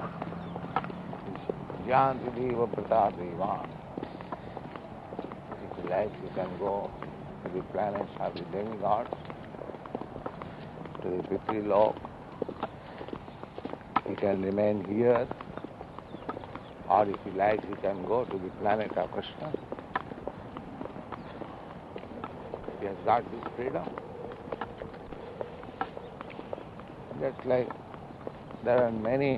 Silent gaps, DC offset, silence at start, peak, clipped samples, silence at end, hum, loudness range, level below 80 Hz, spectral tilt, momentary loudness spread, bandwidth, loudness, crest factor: none; under 0.1%; 0 s; -10 dBFS; under 0.1%; 0 s; none; 8 LU; -58 dBFS; -8.5 dB/octave; 16 LU; 7.6 kHz; -33 LUFS; 24 dB